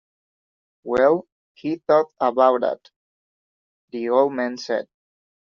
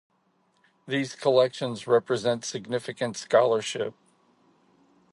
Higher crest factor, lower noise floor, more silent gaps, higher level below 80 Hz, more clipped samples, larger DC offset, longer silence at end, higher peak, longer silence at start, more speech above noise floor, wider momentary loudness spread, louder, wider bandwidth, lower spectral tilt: about the same, 20 dB vs 20 dB; first, under -90 dBFS vs -68 dBFS; first, 1.32-1.55 s, 2.96-3.88 s vs none; first, -64 dBFS vs -74 dBFS; neither; neither; second, 0.7 s vs 1.2 s; first, -4 dBFS vs -8 dBFS; about the same, 0.85 s vs 0.85 s; first, over 70 dB vs 43 dB; first, 15 LU vs 10 LU; first, -21 LUFS vs -26 LUFS; second, 7.2 kHz vs 11.5 kHz; about the same, -4 dB/octave vs -4.5 dB/octave